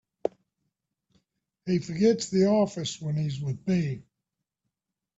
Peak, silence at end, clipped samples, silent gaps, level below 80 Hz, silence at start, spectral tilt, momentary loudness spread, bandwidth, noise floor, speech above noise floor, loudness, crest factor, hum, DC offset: -10 dBFS; 1.15 s; under 0.1%; none; -64 dBFS; 0.25 s; -6.5 dB/octave; 12 LU; 8 kHz; -87 dBFS; 61 dB; -27 LUFS; 20 dB; none; under 0.1%